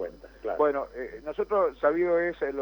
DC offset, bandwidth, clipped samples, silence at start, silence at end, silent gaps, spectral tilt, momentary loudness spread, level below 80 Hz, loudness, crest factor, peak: under 0.1%; 19.5 kHz; under 0.1%; 0 s; 0 s; none; -7.5 dB/octave; 13 LU; -56 dBFS; -27 LUFS; 16 dB; -12 dBFS